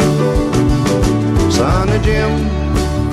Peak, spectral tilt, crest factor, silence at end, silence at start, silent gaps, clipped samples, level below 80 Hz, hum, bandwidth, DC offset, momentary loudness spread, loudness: -2 dBFS; -6.5 dB/octave; 10 dB; 0 s; 0 s; none; under 0.1%; -20 dBFS; none; 15 kHz; under 0.1%; 3 LU; -14 LUFS